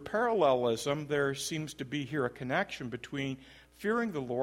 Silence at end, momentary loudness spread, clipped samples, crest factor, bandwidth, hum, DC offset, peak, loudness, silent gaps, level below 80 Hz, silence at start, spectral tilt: 0 s; 11 LU; under 0.1%; 18 dB; 16 kHz; none; under 0.1%; -14 dBFS; -32 LUFS; none; -64 dBFS; 0 s; -5 dB/octave